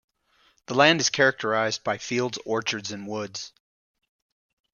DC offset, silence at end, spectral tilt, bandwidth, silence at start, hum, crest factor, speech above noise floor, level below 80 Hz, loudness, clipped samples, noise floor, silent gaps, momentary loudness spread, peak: under 0.1%; 1.25 s; -3 dB/octave; 10 kHz; 0.7 s; none; 24 dB; 39 dB; -68 dBFS; -24 LUFS; under 0.1%; -64 dBFS; none; 14 LU; -2 dBFS